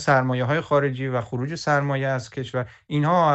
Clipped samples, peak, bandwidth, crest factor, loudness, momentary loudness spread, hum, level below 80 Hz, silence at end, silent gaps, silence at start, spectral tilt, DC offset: under 0.1%; -4 dBFS; 8.2 kHz; 18 dB; -23 LUFS; 9 LU; none; -58 dBFS; 0 s; none; 0 s; -6.5 dB/octave; under 0.1%